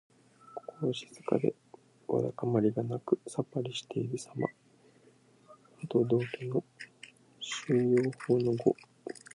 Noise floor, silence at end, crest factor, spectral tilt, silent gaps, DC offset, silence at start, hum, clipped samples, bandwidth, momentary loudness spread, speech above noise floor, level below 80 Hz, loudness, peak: -63 dBFS; 0.25 s; 22 dB; -6.5 dB/octave; none; under 0.1%; 0.5 s; none; under 0.1%; 11.5 kHz; 19 LU; 32 dB; -74 dBFS; -32 LUFS; -12 dBFS